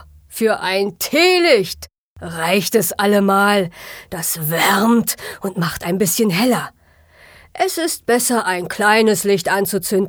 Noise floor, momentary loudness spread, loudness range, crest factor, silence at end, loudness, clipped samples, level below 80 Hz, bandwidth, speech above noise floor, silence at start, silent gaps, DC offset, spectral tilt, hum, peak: -49 dBFS; 13 LU; 3 LU; 16 dB; 0 s; -16 LUFS; under 0.1%; -52 dBFS; over 20 kHz; 33 dB; 0.3 s; 1.98-2.16 s; under 0.1%; -3.5 dB/octave; none; -2 dBFS